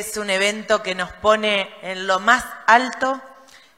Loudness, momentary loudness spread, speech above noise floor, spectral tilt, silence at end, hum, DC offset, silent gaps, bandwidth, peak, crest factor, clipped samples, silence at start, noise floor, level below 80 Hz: -19 LUFS; 10 LU; 27 dB; -2.5 dB/octave; 0.45 s; none; 0.1%; none; 16 kHz; 0 dBFS; 20 dB; under 0.1%; 0 s; -47 dBFS; -54 dBFS